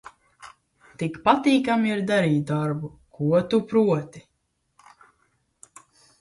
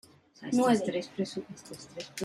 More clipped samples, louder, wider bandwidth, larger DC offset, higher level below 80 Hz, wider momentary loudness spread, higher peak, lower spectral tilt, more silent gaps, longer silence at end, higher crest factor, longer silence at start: neither; first, -23 LUFS vs -30 LUFS; second, 11.5 kHz vs 14.5 kHz; neither; first, -62 dBFS vs -72 dBFS; second, 12 LU vs 19 LU; first, -4 dBFS vs -14 dBFS; first, -7 dB/octave vs -5 dB/octave; neither; first, 2 s vs 0 s; first, 22 dB vs 16 dB; about the same, 0.45 s vs 0.4 s